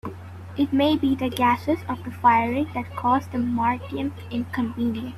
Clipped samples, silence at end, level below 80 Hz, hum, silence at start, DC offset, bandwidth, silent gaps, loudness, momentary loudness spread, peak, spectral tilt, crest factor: under 0.1%; 0 s; -56 dBFS; none; 0.05 s; under 0.1%; 14 kHz; none; -23 LUFS; 10 LU; -6 dBFS; -6.5 dB/octave; 18 dB